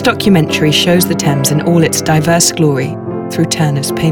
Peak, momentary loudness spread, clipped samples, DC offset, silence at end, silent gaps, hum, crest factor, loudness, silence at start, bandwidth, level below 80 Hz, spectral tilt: 0 dBFS; 7 LU; under 0.1%; under 0.1%; 0 s; none; none; 12 dB; -11 LUFS; 0 s; 19 kHz; -42 dBFS; -4.5 dB/octave